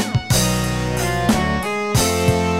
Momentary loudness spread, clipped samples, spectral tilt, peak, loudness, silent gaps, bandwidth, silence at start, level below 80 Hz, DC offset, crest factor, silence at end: 4 LU; under 0.1%; -4.5 dB/octave; -4 dBFS; -18 LUFS; none; 16.5 kHz; 0 s; -32 dBFS; under 0.1%; 16 dB; 0 s